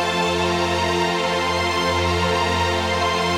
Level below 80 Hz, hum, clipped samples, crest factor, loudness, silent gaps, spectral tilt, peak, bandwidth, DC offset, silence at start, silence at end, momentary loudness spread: -40 dBFS; none; under 0.1%; 12 dB; -20 LUFS; none; -4 dB/octave; -8 dBFS; 16 kHz; under 0.1%; 0 s; 0 s; 1 LU